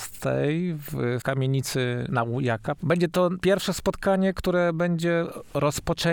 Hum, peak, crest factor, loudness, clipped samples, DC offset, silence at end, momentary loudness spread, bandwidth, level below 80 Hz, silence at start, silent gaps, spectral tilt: none; -10 dBFS; 16 dB; -25 LUFS; under 0.1%; under 0.1%; 0 s; 5 LU; over 20 kHz; -48 dBFS; 0 s; none; -6 dB/octave